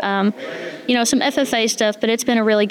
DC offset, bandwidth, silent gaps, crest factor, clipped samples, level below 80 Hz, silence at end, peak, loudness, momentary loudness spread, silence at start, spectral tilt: under 0.1%; 17.5 kHz; none; 14 dB; under 0.1%; -62 dBFS; 0 s; -4 dBFS; -18 LUFS; 9 LU; 0 s; -3 dB/octave